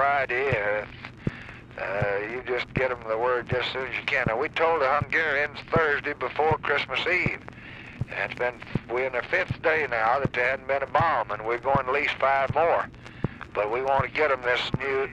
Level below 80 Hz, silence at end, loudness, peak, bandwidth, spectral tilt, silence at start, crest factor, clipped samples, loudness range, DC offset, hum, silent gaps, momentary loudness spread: -50 dBFS; 0 s; -26 LUFS; -8 dBFS; 9.6 kHz; -6 dB/octave; 0 s; 18 dB; under 0.1%; 3 LU; under 0.1%; none; none; 11 LU